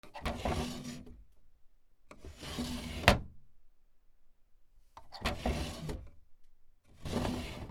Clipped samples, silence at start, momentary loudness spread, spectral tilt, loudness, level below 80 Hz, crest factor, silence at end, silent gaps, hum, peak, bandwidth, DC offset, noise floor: under 0.1%; 0.05 s; 23 LU; -4.5 dB/octave; -36 LUFS; -46 dBFS; 36 dB; 0 s; none; none; -4 dBFS; 19.5 kHz; under 0.1%; -60 dBFS